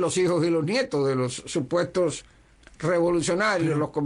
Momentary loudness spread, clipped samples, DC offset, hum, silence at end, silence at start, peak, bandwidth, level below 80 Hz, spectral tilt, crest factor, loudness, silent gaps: 5 LU; under 0.1%; under 0.1%; none; 0 s; 0 s; -14 dBFS; 11 kHz; -56 dBFS; -5 dB/octave; 12 dB; -24 LUFS; none